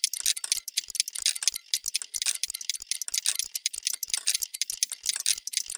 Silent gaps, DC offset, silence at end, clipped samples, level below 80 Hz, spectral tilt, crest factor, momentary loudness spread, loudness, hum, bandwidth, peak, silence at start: none; under 0.1%; 0 s; under 0.1%; -70 dBFS; 5.5 dB/octave; 28 dB; 5 LU; -28 LUFS; none; over 20 kHz; -4 dBFS; 0.05 s